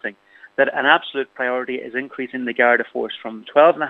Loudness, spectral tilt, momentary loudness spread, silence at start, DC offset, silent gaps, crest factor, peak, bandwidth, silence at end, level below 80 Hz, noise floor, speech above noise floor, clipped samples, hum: -20 LUFS; -6 dB/octave; 13 LU; 0.05 s; under 0.1%; none; 20 dB; 0 dBFS; 4.6 kHz; 0 s; -78 dBFS; -38 dBFS; 19 dB; under 0.1%; none